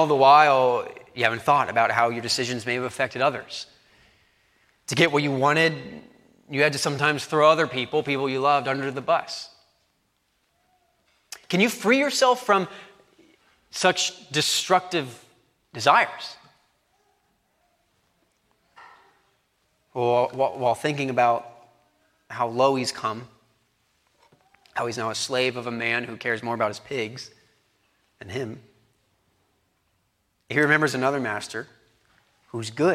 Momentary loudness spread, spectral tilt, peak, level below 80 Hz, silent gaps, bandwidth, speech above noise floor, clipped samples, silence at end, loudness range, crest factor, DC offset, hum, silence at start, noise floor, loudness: 18 LU; -4 dB/octave; -2 dBFS; -70 dBFS; none; 16 kHz; 48 dB; under 0.1%; 0 s; 7 LU; 22 dB; under 0.1%; none; 0 s; -71 dBFS; -23 LUFS